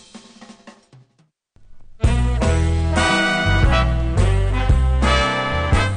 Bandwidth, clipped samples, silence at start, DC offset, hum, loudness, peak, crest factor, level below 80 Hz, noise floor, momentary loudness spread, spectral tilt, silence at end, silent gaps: 10 kHz; under 0.1%; 0.15 s; under 0.1%; none; -18 LUFS; -4 dBFS; 14 dB; -22 dBFS; -62 dBFS; 3 LU; -5.5 dB/octave; 0 s; none